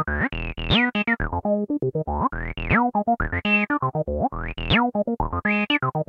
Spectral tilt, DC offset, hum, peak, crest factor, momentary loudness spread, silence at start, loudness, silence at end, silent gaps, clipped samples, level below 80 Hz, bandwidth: -8 dB/octave; under 0.1%; none; -6 dBFS; 18 dB; 6 LU; 0 s; -23 LUFS; 0.05 s; none; under 0.1%; -36 dBFS; 6.2 kHz